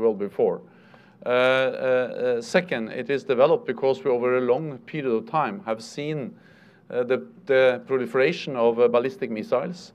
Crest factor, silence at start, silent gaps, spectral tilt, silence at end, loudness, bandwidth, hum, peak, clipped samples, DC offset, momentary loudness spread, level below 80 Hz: 18 dB; 0 s; none; -6 dB/octave; 0.05 s; -24 LUFS; 10 kHz; none; -4 dBFS; under 0.1%; under 0.1%; 11 LU; -76 dBFS